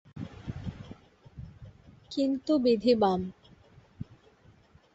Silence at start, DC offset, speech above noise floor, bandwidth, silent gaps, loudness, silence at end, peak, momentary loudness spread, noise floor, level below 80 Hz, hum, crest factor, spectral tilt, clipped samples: 0.15 s; under 0.1%; 34 dB; 8 kHz; none; -29 LUFS; 0.9 s; -12 dBFS; 24 LU; -60 dBFS; -56 dBFS; none; 20 dB; -7.5 dB/octave; under 0.1%